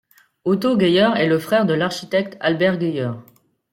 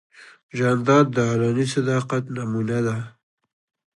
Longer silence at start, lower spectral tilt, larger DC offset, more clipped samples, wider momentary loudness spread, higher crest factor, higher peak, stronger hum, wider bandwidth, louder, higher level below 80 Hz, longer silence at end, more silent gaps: first, 0.45 s vs 0.2 s; about the same, -6 dB/octave vs -6.5 dB/octave; neither; neither; about the same, 10 LU vs 11 LU; about the same, 16 dB vs 20 dB; about the same, -4 dBFS vs -2 dBFS; neither; first, 16.5 kHz vs 11.5 kHz; first, -19 LUFS vs -22 LUFS; about the same, -62 dBFS vs -60 dBFS; second, 0.5 s vs 0.9 s; second, none vs 0.43-0.49 s